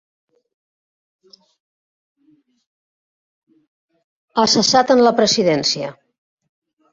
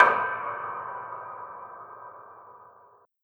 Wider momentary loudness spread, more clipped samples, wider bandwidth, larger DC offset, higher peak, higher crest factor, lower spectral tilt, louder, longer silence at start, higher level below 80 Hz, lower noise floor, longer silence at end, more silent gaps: second, 12 LU vs 21 LU; neither; about the same, 7.8 kHz vs 8.4 kHz; neither; about the same, -2 dBFS vs -2 dBFS; second, 20 dB vs 26 dB; second, -3 dB/octave vs -5 dB/octave; first, -15 LUFS vs -30 LUFS; first, 4.35 s vs 0 s; first, -62 dBFS vs -82 dBFS; about the same, -59 dBFS vs -58 dBFS; first, 1 s vs 0.6 s; neither